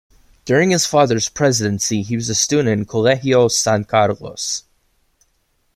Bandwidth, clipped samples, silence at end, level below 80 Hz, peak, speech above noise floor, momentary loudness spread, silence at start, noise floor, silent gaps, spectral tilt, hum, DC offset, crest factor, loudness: 15.5 kHz; under 0.1%; 1.15 s; -52 dBFS; -2 dBFS; 47 dB; 9 LU; 0.45 s; -64 dBFS; none; -4 dB/octave; none; under 0.1%; 16 dB; -17 LUFS